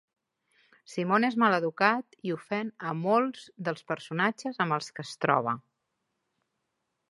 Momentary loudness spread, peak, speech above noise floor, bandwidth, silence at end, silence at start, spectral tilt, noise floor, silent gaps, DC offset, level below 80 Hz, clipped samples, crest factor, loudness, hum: 11 LU; -8 dBFS; 53 dB; 11.5 kHz; 1.55 s; 0.9 s; -6 dB/octave; -81 dBFS; none; under 0.1%; -80 dBFS; under 0.1%; 24 dB; -29 LUFS; none